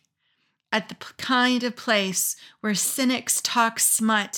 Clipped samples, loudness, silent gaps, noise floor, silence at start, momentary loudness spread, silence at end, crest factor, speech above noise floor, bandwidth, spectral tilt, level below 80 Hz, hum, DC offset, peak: under 0.1%; -22 LUFS; none; -71 dBFS; 0.7 s; 8 LU; 0 s; 18 dB; 48 dB; 18 kHz; -1.5 dB/octave; -80 dBFS; none; under 0.1%; -6 dBFS